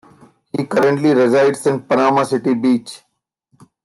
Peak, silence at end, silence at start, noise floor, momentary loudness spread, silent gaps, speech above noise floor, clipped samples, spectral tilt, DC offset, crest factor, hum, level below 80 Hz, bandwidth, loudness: -4 dBFS; 0.9 s; 0.55 s; -67 dBFS; 9 LU; none; 52 dB; under 0.1%; -6 dB/octave; under 0.1%; 14 dB; none; -66 dBFS; 12.5 kHz; -16 LUFS